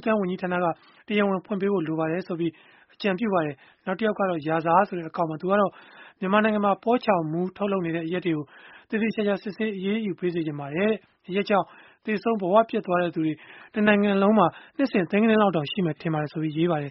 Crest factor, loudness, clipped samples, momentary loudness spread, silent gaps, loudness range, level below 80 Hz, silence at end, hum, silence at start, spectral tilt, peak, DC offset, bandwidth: 20 dB; -25 LUFS; under 0.1%; 9 LU; none; 5 LU; -66 dBFS; 0 s; none; 0 s; -5 dB/octave; -4 dBFS; under 0.1%; 5.8 kHz